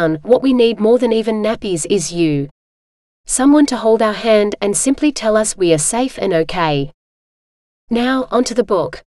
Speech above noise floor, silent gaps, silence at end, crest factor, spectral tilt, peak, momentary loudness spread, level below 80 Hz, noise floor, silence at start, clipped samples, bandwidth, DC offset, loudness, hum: over 76 dB; 2.51-3.24 s, 6.94-7.88 s; 0.15 s; 16 dB; -4.5 dB/octave; 0 dBFS; 6 LU; -42 dBFS; under -90 dBFS; 0 s; under 0.1%; 13 kHz; under 0.1%; -15 LUFS; none